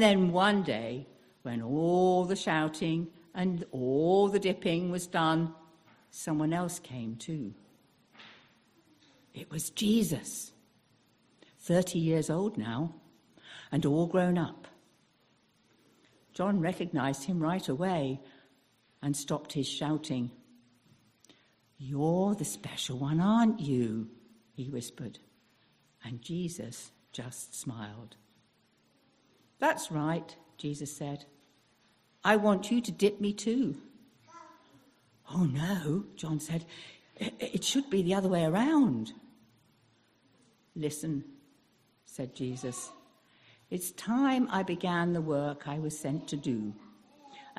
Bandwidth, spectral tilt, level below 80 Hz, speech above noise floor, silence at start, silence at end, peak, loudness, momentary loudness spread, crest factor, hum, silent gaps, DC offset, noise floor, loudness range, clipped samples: 14.5 kHz; -5.5 dB/octave; -68 dBFS; 39 dB; 0 s; 0.05 s; -8 dBFS; -31 LUFS; 18 LU; 24 dB; none; none; under 0.1%; -69 dBFS; 10 LU; under 0.1%